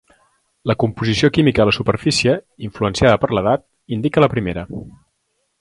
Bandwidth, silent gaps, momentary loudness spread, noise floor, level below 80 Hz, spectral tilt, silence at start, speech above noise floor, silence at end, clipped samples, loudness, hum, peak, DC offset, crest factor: 11.5 kHz; none; 13 LU; -69 dBFS; -40 dBFS; -5.5 dB/octave; 0.65 s; 52 dB; 0.7 s; under 0.1%; -17 LUFS; none; 0 dBFS; under 0.1%; 18 dB